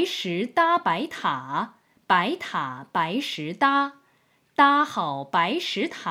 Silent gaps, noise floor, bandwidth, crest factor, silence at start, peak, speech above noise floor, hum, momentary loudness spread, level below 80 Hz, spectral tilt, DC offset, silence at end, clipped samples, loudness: none; -64 dBFS; 16 kHz; 20 dB; 0 s; -4 dBFS; 40 dB; none; 10 LU; -78 dBFS; -4.5 dB/octave; under 0.1%; 0 s; under 0.1%; -24 LUFS